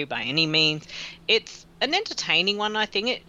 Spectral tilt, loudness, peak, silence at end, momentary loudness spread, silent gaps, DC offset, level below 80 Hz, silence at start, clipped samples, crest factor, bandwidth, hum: -3 dB/octave; -23 LUFS; -6 dBFS; 0.1 s; 12 LU; none; under 0.1%; -60 dBFS; 0 s; under 0.1%; 20 dB; 9.8 kHz; none